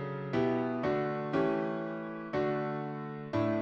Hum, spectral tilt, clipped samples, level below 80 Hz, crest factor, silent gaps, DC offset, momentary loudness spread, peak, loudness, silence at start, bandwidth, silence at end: none; -8.5 dB/octave; under 0.1%; -64 dBFS; 16 dB; none; under 0.1%; 8 LU; -18 dBFS; -33 LUFS; 0 s; 7 kHz; 0 s